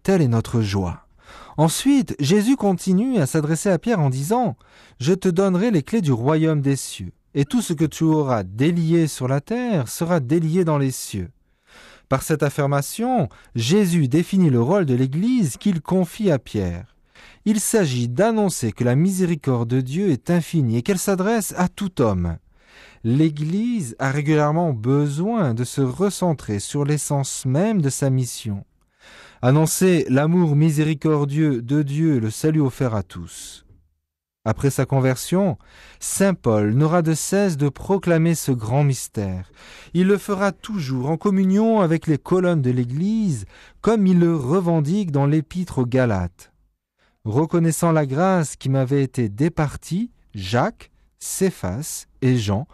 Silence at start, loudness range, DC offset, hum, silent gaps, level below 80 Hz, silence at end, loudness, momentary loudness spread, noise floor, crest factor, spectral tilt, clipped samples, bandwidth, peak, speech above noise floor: 0.05 s; 3 LU; under 0.1%; none; none; -50 dBFS; 0.1 s; -20 LUFS; 9 LU; -79 dBFS; 14 dB; -6.5 dB/octave; under 0.1%; 13 kHz; -6 dBFS; 59 dB